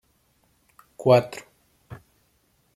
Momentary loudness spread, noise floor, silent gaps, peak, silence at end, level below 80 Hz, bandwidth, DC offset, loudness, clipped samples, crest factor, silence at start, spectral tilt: 27 LU; -66 dBFS; none; -4 dBFS; 0.8 s; -66 dBFS; 15 kHz; under 0.1%; -21 LUFS; under 0.1%; 24 dB; 1 s; -6.5 dB/octave